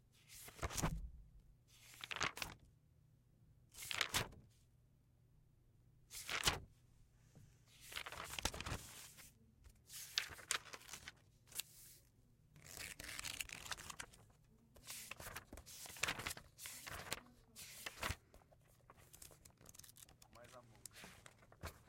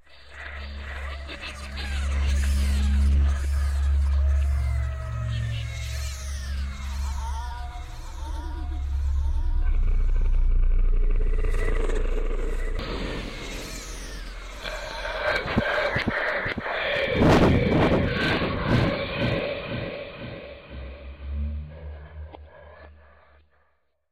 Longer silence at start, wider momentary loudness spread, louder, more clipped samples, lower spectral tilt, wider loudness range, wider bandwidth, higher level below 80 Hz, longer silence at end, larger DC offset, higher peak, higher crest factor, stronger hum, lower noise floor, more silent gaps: about the same, 0.05 s vs 0.1 s; first, 21 LU vs 16 LU; second, -46 LUFS vs -27 LUFS; neither; second, -2 dB/octave vs -6 dB/octave; second, 6 LU vs 11 LU; first, 16.5 kHz vs 12.5 kHz; second, -62 dBFS vs -26 dBFS; second, 0 s vs 1.15 s; neither; second, -14 dBFS vs -10 dBFS; first, 38 dB vs 14 dB; neither; about the same, -72 dBFS vs -70 dBFS; neither